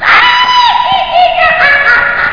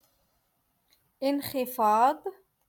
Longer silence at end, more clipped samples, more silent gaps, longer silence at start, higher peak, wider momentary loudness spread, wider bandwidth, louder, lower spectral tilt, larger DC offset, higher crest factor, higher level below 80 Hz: second, 0 s vs 0.35 s; first, 0.6% vs under 0.1%; neither; second, 0 s vs 1.2 s; first, 0 dBFS vs -12 dBFS; second, 4 LU vs 13 LU; second, 5.4 kHz vs 17.5 kHz; first, -6 LUFS vs -27 LUFS; second, -2 dB/octave vs -4.5 dB/octave; first, 2% vs under 0.1%; second, 8 dB vs 18 dB; first, -38 dBFS vs -72 dBFS